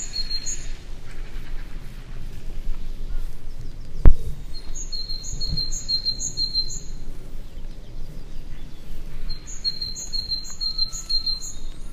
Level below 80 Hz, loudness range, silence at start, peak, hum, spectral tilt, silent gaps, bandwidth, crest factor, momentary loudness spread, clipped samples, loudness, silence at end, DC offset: -26 dBFS; 9 LU; 0 s; 0 dBFS; none; -2.5 dB/octave; none; 8 kHz; 22 dB; 19 LU; 0.1%; -26 LUFS; 0 s; under 0.1%